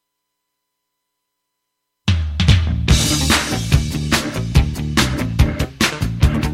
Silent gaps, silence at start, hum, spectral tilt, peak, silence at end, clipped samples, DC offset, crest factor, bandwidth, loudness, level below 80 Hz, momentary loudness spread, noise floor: none; 2.05 s; 60 Hz at -40 dBFS; -4.5 dB/octave; -2 dBFS; 0 s; under 0.1%; under 0.1%; 16 dB; 16.5 kHz; -17 LUFS; -24 dBFS; 4 LU; -76 dBFS